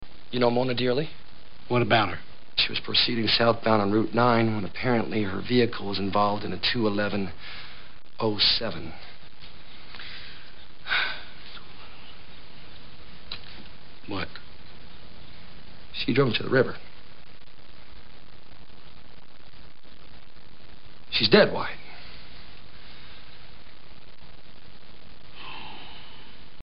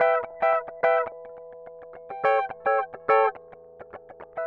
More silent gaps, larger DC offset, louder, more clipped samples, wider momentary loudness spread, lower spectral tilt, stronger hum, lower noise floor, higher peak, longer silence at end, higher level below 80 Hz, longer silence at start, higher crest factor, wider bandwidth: neither; first, 3% vs under 0.1%; about the same, -24 LUFS vs -24 LUFS; neither; first, 26 LU vs 22 LU; first, -9.5 dB/octave vs -5.5 dB/octave; neither; first, -52 dBFS vs -47 dBFS; about the same, -4 dBFS vs -6 dBFS; first, 0.3 s vs 0 s; first, -54 dBFS vs -68 dBFS; about the same, 0 s vs 0 s; first, 26 dB vs 20 dB; about the same, 5.8 kHz vs 5.4 kHz